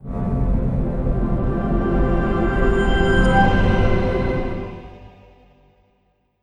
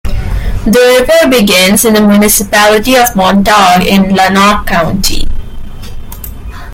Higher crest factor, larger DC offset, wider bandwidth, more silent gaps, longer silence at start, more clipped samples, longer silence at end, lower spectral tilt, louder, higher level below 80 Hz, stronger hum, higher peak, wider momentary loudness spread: first, 16 dB vs 8 dB; neither; second, 9.4 kHz vs 17.5 kHz; neither; about the same, 0 s vs 0.05 s; second, under 0.1% vs 0.3%; first, 1.35 s vs 0 s; first, -8 dB/octave vs -4 dB/octave; second, -20 LUFS vs -7 LUFS; about the same, -24 dBFS vs -20 dBFS; neither; about the same, -2 dBFS vs 0 dBFS; second, 9 LU vs 19 LU